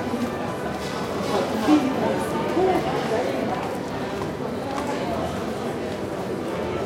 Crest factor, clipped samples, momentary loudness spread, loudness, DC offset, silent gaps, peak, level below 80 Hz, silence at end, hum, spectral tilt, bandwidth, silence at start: 18 dB; under 0.1%; 8 LU; -25 LUFS; under 0.1%; none; -6 dBFS; -50 dBFS; 0 s; none; -5.5 dB/octave; 16.5 kHz; 0 s